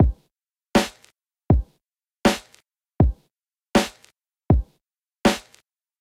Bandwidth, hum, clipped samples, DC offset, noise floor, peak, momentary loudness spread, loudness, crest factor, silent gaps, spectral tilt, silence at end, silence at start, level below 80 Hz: 16 kHz; none; under 0.1%; under 0.1%; -76 dBFS; -2 dBFS; 14 LU; -23 LUFS; 22 dB; none; -5.5 dB/octave; 0.6 s; 0 s; -30 dBFS